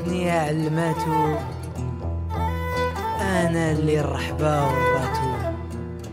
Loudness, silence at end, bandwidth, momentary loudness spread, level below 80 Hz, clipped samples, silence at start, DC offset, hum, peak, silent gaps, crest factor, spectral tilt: -24 LUFS; 0 s; 16 kHz; 9 LU; -38 dBFS; under 0.1%; 0 s; under 0.1%; none; -10 dBFS; none; 14 dB; -6.5 dB/octave